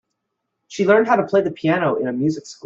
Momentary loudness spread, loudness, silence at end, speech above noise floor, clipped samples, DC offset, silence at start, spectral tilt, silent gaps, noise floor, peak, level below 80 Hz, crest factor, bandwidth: 7 LU; -18 LUFS; 0.15 s; 59 dB; under 0.1%; under 0.1%; 0.7 s; -6.5 dB/octave; none; -77 dBFS; -4 dBFS; -64 dBFS; 16 dB; 7.8 kHz